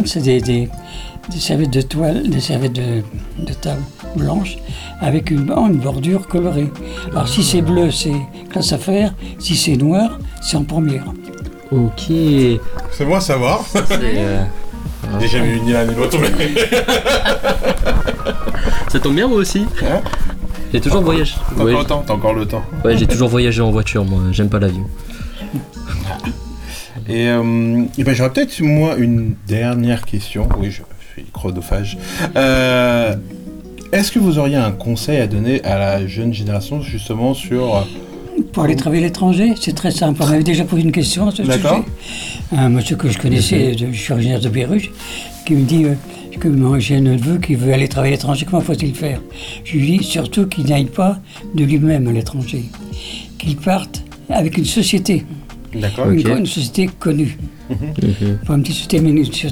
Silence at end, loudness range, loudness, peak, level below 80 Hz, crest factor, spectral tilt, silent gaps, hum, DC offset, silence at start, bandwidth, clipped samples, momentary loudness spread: 0 s; 3 LU; -16 LUFS; -4 dBFS; -28 dBFS; 10 dB; -6 dB/octave; none; none; 0.2%; 0 s; 20 kHz; under 0.1%; 12 LU